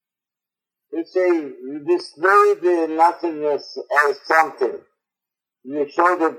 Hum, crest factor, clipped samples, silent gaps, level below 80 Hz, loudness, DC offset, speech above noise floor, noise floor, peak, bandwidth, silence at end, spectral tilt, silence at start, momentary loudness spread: none; 18 dB; under 0.1%; none; -86 dBFS; -19 LUFS; under 0.1%; 70 dB; -88 dBFS; -2 dBFS; 15 kHz; 0 s; -4 dB/octave; 0.9 s; 15 LU